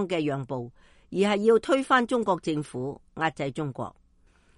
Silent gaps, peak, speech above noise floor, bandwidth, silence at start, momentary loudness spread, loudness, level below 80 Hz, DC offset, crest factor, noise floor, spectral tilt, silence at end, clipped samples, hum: none; -8 dBFS; 35 dB; 11.5 kHz; 0 s; 14 LU; -26 LUFS; -60 dBFS; under 0.1%; 18 dB; -61 dBFS; -6 dB/octave; 0.65 s; under 0.1%; none